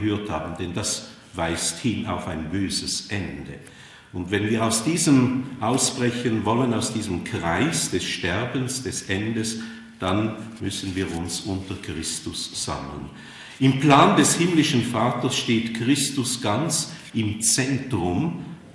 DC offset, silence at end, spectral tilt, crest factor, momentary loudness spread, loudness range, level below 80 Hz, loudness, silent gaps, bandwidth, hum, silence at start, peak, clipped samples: under 0.1%; 0 s; -4 dB/octave; 22 dB; 13 LU; 8 LU; -54 dBFS; -23 LUFS; none; 12 kHz; none; 0 s; -2 dBFS; under 0.1%